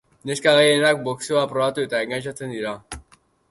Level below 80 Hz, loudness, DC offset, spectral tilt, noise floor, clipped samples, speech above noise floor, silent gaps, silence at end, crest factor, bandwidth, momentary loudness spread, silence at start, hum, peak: -54 dBFS; -21 LUFS; under 0.1%; -3.5 dB/octave; -56 dBFS; under 0.1%; 36 dB; none; 0.5 s; 18 dB; 11.5 kHz; 16 LU; 0.25 s; none; -4 dBFS